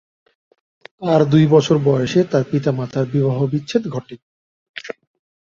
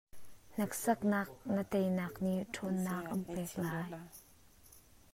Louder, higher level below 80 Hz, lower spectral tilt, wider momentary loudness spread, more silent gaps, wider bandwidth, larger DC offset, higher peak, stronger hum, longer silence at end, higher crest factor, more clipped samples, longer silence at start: first, -17 LUFS vs -37 LUFS; first, -56 dBFS vs -66 dBFS; first, -7.5 dB/octave vs -6 dB/octave; first, 19 LU vs 12 LU; first, 4.22-4.74 s vs none; second, 7.6 kHz vs 16 kHz; neither; first, -2 dBFS vs -20 dBFS; neither; first, 0.7 s vs 0.35 s; about the same, 18 dB vs 18 dB; neither; first, 1 s vs 0.15 s